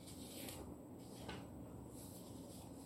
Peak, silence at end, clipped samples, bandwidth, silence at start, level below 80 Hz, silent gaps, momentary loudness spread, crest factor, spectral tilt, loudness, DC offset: -32 dBFS; 0 s; under 0.1%; 16.5 kHz; 0 s; -66 dBFS; none; 4 LU; 22 dB; -4.5 dB/octave; -53 LUFS; under 0.1%